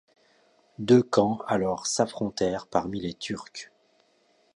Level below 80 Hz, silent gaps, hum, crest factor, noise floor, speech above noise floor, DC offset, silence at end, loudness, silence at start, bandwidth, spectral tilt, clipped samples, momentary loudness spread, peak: -60 dBFS; none; none; 22 dB; -66 dBFS; 40 dB; under 0.1%; 0.9 s; -26 LUFS; 0.8 s; 11.5 kHz; -5 dB/octave; under 0.1%; 16 LU; -6 dBFS